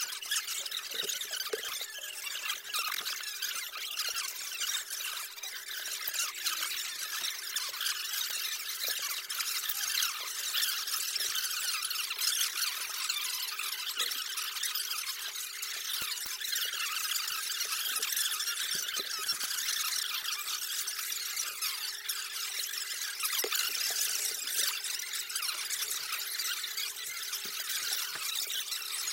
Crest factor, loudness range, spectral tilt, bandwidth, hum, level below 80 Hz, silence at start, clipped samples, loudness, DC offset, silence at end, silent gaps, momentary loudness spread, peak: 20 dB; 3 LU; 3.5 dB/octave; 17 kHz; none; -80 dBFS; 0 s; under 0.1%; -32 LUFS; under 0.1%; 0 s; none; 6 LU; -16 dBFS